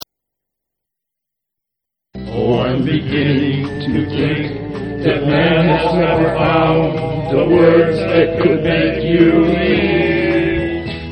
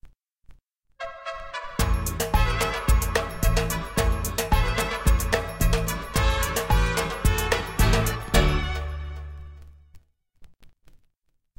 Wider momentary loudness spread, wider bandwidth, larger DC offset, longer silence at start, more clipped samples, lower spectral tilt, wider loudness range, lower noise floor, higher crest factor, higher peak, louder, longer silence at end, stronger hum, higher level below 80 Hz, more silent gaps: second, 9 LU vs 13 LU; second, 8.6 kHz vs 17 kHz; neither; first, 2.15 s vs 0.05 s; neither; first, -8.5 dB/octave vs -4.5 dB/octave; about the same, 6 LU vs 4 LU; first, -81 dBFS vs -70 dBFS; about the same, 14 dB vs 18 dB; first, 0 dBFS vs -6 dBFS; first, -14 LUFS vs -25 LUFS; second, 0 s vs 0.9 s; neither; second, -36 dBFS vs -28 dBFS; neither